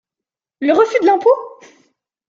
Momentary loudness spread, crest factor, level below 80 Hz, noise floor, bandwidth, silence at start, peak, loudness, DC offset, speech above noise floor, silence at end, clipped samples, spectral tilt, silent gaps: 9 LU; 16 dB; -70 dBFS; -87 dBFS; 7.6 kHz; 0.6 s; -2 dBFS; -14 LUFS; under 0.1%; 73 dB; 0.8 s; under 0.1%; -4.5 dB/octave; none